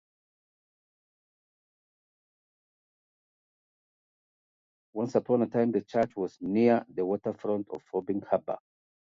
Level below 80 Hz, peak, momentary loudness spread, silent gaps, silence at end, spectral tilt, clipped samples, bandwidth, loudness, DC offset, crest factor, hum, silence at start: -72 dBFS; -12 dBFS; 10 LU; none; 0.5 s; -8.5 dB/octave; under 0.1%; 7.4 kHz; -29 LUFS; under 0.1%; 22 dB; none; 4.95 s